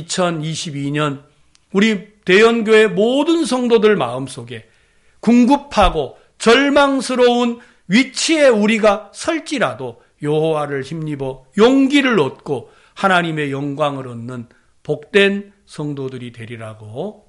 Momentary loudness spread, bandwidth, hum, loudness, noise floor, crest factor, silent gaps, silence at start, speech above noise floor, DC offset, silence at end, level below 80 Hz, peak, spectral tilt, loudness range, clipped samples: 18 LU; 11.5 kHz; none; -16 LUFS; -54 dBFS; 16 dB; none; 0 s; 38 dB; under 0.1%; 0.15 s; -40 dBFS; 0 dBFS; -5 dB/octave; 5 LU; under 0.1%